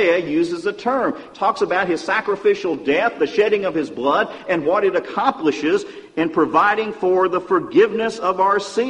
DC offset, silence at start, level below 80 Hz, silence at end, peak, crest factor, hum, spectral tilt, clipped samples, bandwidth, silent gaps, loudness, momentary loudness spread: under 0.1%; 0 s; -60 dBFS; 0 s; -4 dBFS; 14 dB; none; -5 dB/octave; under 0.1%; 10 kHz; none; -19 LUFS; 5 LU